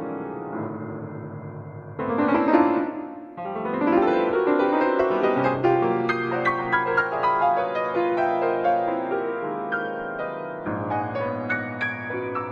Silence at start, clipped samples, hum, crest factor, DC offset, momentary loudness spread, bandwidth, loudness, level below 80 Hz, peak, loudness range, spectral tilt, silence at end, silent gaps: 0 s; under 0.1%; none; 20 dB; under 0.1%; 13 LU; 6.6 kHz; -24 LUFS; -60 dBFS; -4 dBFS; 5 LU; -8 dB/octave; 0 s; none